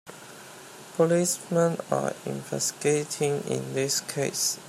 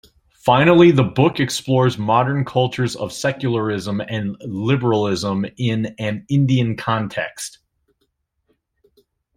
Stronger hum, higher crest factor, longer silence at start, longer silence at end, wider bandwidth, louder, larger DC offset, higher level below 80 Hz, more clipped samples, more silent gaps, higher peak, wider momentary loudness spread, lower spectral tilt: neither; about the same, 18 dB vs 18 dB; second, 0.05 s vs 0.45 s; second, 0 s vs 1.9 s; about the same, 16 kHz vs 15 kHz; second, -27 LUFS vs -18 LUFS; neither; second, -72 dBFS vs -54 dBFS; neither; neither; second, -10 dBFS vs -2 dBFS; first, 20 LU vs 12 LU; second, -4 dB/octave vs -6 dB/octave